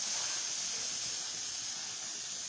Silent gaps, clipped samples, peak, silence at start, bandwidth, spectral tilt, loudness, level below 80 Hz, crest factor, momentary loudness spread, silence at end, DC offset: none; under 0.1%; -24 dBFS; 0 s; 8 kHz; 1.5 dB/octave; -35 LUFS; -76 dBFS; 14 dB; 5 LU; 0 s; under 0.1%